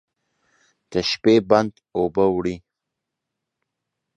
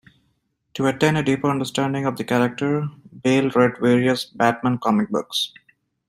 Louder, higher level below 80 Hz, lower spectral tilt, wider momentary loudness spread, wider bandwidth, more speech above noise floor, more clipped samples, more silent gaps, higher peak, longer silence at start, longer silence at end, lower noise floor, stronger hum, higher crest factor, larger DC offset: about the same, -20 LUFS vs -21 LUFS; first, -54 dBFS vs -60 dBFS; about the same, -5.5 dB/octave vs -5.5 dB/octave; first, 11 LU vs 7 LU; second, 8.6 kHz vs 15.5 kHz; first, 63 dB vs 49 dB; neither; neither; about the same, -2 dBFS vs -2 dBFS; first, 0.9 s vs 0.75 s; first, 1.6 s vs 0.6 s; first, -83 dBFS vs -69 dBFS; neither; about the same, 22 dB vs 18 dB; neither